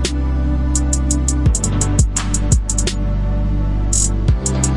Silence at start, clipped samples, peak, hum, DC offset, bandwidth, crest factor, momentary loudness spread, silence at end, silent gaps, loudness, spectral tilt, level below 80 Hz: 0 s; under 0.1%; -2 dBFS; none; under 0.1%; 11.5 kHz; 14 dB; 4 LU; 0 s; none; -17 LUFS; -4.5 dB/octave; -18 dBFS